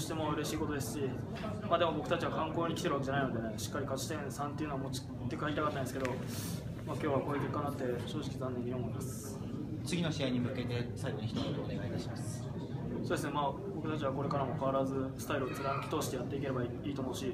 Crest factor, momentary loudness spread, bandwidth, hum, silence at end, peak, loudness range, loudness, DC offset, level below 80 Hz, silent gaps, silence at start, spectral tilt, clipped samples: 20 dB; 6 LU; 15.5 kHz; none; 0 s; -16 dBFS; 3 LU; -37 LUFS; under 0.1%; -56 dBFS; none; 0 s; -6 dB/octave; under 0.1%